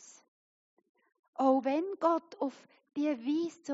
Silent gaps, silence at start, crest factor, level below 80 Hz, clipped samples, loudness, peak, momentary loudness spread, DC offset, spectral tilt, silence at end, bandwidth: 0.28-0.77 s, 0.89-0.95 s, 1.19-1.33 s; 0.05 s; 20 dB; under -90 dBFS; under 0.1%; -32 LUFS; -14 dBFS; 10 LU; under 0.1%; -3.5 dB/octave; 0 s; 7.6 kHz